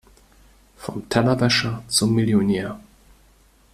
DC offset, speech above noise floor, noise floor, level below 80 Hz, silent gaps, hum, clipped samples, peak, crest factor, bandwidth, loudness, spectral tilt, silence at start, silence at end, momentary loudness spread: under 0.1%; 35 dB; -55 dBFS; -50 dBFS; none; none; under 0.1%; -4 dBFS; 20 dB; 15 kHz; -20 LUFS; -4.5 dB/octave; 0.8 s; 0.95 s; 15 LU